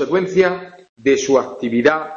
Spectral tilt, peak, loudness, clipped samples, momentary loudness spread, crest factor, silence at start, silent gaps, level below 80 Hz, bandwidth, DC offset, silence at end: -5 dB/octave; 0 dBFS; -17 LUFS; under 0.1%; 6 LU; 16 dB; 0 s; 0.89-0.96 s; -54 dBFS; 7.4 kHz; under 0.1%; 0 s